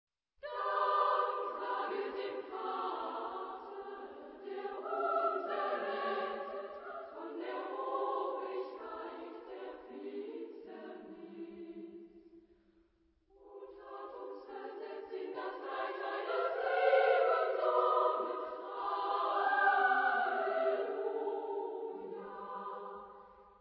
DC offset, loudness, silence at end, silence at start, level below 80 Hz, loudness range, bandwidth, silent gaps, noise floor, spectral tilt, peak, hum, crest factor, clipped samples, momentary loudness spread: under 0.1%; -36 LUFS; 0.1 s; 0.45 s; -82 dBFS; 17 LU; 5.6 kHz; none; -73 dBFS; 0 dB/octave; -18 dBFS; none; 20 dB; under 0.1%; 19 LU